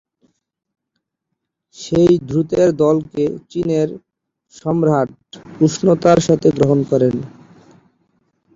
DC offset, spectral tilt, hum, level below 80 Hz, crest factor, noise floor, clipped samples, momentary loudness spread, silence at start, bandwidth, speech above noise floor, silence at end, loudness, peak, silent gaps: under 0.1%; -7 dB/octave; none; -50 dBFS; 16 dB; -77 dBFS; under 0.1%; 12 LU; 1.8 s; 7.8 kHz; 62 dB; 1.25 s; -16 LUFS; -2 dBFS; none